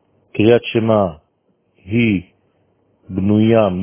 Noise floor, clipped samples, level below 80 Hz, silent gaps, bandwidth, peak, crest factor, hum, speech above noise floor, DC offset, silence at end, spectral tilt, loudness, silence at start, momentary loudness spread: -63 dBFS; under 0.1%; -44 dBFS; none; 3.6 kHz; 0 dBFS; 16 dB; none; 49 dB; under 0.1%; 0 s; -11.5 dB/octave; -16 LUFS; 0.35 s; 10 LU